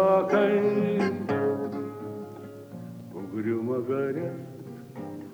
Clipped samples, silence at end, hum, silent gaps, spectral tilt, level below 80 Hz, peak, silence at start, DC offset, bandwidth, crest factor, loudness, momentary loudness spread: under 0.1%; 0 s; none; none; -8 dB/octave; -72 dBFS; -10 dBFS; 0 s; under 0.1%; over 20 kHz; 18 dB; -27 LUFS; 19 LU